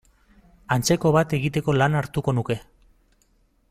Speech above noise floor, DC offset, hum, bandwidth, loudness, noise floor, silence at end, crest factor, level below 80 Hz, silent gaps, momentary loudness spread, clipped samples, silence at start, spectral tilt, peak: 41 dB; under 0.1%; none; 16 kHz; -22 LUFS; -63 dBFS; 1.1 s; 18 dB; -50 dBFS; none; 7 LU; under 0.1%; 0.7 s; -5.5 dB/octave; -6 dBFS